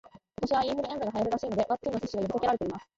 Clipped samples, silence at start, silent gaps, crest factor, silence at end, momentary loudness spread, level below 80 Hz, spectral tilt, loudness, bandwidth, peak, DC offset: under 0.1%; 0.15 s; none; 14 dB; 0.15 s; 4 LU; -56 dBFS; -6 dB/octave; -30 LUFS; 7.8 kHz; -16 dBFS; under 0.1%